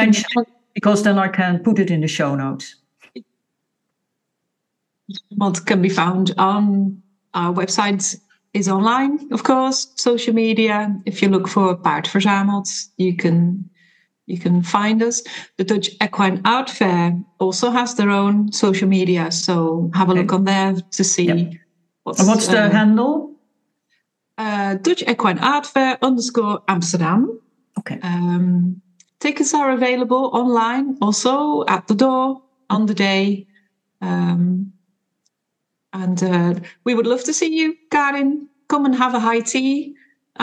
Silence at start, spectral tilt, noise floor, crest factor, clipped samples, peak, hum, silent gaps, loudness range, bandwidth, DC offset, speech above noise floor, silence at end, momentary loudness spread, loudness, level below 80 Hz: 0 s; -5 dB/octave; -77 dBFS; 18 dB; under 0.1%; 0 dBFS; none; none; 4 LU; 10 kHz; under 0.1%; 60 dB; 0 s; 9 LU; -18 LUFS; -72 dBFS